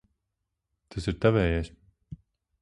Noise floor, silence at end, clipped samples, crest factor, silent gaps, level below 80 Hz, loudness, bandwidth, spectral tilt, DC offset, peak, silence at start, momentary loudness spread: -83 dBFS; 0.45 s; under 0.1%; 22 dB; none; -42 dBFS; -27 LUFS; 11 kHz; -7.5 dB/octave; under 0.1%; -8 dBFS; 0.95 s; 24 LU